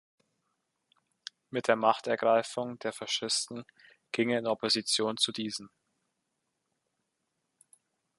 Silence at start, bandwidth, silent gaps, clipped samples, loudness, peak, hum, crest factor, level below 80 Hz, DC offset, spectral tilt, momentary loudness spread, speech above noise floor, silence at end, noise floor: 1.5 s; 11.5 kHz; none; under 0.1%; -30 LUFS; -8 dBFS; none; 26 dB; -80 dBFS; under 0.1%; -2.5 dB/octave; 14 LU; 52 dB; 2.5 s; -82 dBFS